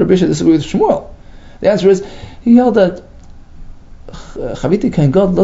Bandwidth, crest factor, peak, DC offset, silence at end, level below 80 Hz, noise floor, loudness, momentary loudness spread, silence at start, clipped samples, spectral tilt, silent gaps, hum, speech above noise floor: 7.8 kHz; 14 dB; 0 dBFS; under 0.1%; 0 s; -34 dBFS; -35 dBFS; -13 LUFS; 15 LU; 0 s; under 0.1%; -7.5 dB/octave; none; none; 23 dB